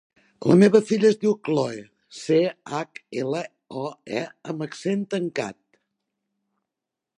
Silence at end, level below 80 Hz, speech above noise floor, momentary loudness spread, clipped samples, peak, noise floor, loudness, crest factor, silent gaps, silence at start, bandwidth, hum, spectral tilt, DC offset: 1.7 s; -70 dBFS; 64 dB; 16 LU; under 0.1%; -4 dBFS; -86 dBFS; -23 LUFS; 20 dB; none; 0.4 s; 11 kHz; none; -6.5 dB/octave; under 0.1%